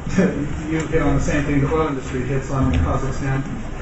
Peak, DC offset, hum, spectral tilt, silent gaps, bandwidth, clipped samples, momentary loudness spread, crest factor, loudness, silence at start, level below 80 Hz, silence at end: -4 dBFS; under 0.1%; none; -7 dB/octave; none; 8.2 kHz; under 0.1%; 5 LU; 16 dB; -21 LUFS; 0 s; -26 dBFS; 0 s